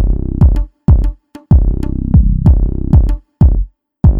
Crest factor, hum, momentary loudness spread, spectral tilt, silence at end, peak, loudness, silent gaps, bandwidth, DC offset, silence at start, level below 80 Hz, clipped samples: 10 dB; none; 7 LU; -11 dB/octave; 0 s; 0 dBFS; -13 LUFS; none; 2.1 kHz; under 0.1%; 0 s; -12 dBFS; under 0.1%